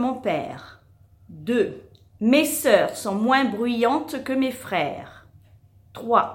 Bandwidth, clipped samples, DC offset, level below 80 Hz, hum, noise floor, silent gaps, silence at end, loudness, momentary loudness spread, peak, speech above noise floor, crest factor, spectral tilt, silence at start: 17 kHz; under 0.1%; under 0.1%; -60 dBFS; none; -54 dBFS; none; 0 s; -22 LUFS; 17 LU; -2 dBFS; 32 dB; 22 dB; -4 dB/octave; 0 s